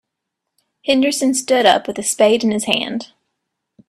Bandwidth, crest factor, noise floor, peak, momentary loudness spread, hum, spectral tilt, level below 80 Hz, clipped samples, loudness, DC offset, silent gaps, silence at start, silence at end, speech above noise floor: 14 kHz; 18 dB; -79 dBFS; 0 dBFS; 10 LU; none; -2.5 dB/octave; -62 dBFS; under 0.1%; -16 LUFS; under 0.1%; none; 0.85 s; 0.85 s; 63 dB